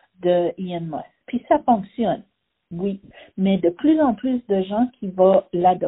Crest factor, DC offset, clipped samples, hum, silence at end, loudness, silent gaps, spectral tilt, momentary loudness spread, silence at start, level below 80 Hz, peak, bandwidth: 16 dB; under 0.1%; under 0.1%; none; 0 s; -21 LUFS; none; -6.5 dB/octave; 13 LU; 0.2 s; -58 dBFS; -4 dBFS; 4 kHz